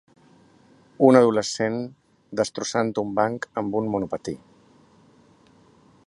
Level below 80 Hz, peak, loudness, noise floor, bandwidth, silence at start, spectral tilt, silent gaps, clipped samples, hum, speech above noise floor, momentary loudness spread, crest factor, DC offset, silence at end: -62 dBFS; -2 dBFS; -23 LUFS; -56 dBFS; 11.5 kHz; 1 s; -5 dB/octave; none; under 0.1%; none; 34 dB; 16 LU; 24 dB; under 0.1%; 1.7 s